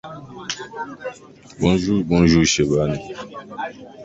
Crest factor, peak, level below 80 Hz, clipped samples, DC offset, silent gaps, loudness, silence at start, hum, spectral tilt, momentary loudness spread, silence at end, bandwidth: 18 dB; -2 dBFS; -40 dBFS; under 0.1%; under 0.1%; none; -19 LUFS; 0.05 s; none; -5 dB/octave; 19 LU; 0 s; 8 kHz